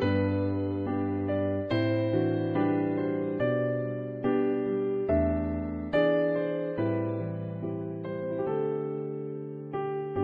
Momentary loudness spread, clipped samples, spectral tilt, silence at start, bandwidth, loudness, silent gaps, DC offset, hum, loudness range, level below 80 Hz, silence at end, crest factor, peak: 8 LU; under 0.1%; -10.5 dB/octave; 0 s; 5.2 kHz; -30 LUFS; none; under 0.1%; none; 4 LU; -50 dBFS; 0 s; 16 dB; -14 dBFS